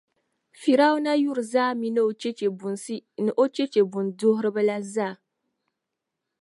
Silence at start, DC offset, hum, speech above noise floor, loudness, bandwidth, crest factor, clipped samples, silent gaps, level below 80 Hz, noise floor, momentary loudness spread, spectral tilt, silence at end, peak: 0.6 s; under 0.1%; none; 60 dB; -24 LUFS; 11.5 kHz; 18 dB; under 0.1%; none; -82 dBFS; -84 dBFS; 10 LU; -5.5 dB/octave; 1.3 s; -8 dBFS